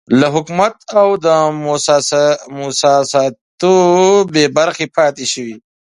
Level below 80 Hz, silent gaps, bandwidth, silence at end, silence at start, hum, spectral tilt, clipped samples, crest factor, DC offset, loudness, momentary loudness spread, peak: -60 dBFS; 3.41-3.58 s; 11.5 kHz; 0.35 s; 0.1 s; none; -4 dB/octave; under 0.1%; 12 dB; under 0.1%; -13 LUFS; 9 LU; 0 dBFS